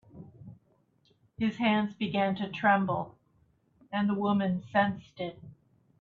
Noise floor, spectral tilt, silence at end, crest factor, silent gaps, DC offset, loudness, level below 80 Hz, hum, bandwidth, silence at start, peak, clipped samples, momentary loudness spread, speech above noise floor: -69 dBFS; -8 dB/octave; 0.5 s; 22 dB; none; under 0.1%; -30 LUFS; -68 dBFS; none; 6.6 kHz; 0.15 s; -10 dBFS; under 0.1%; 14 LU; 40 dB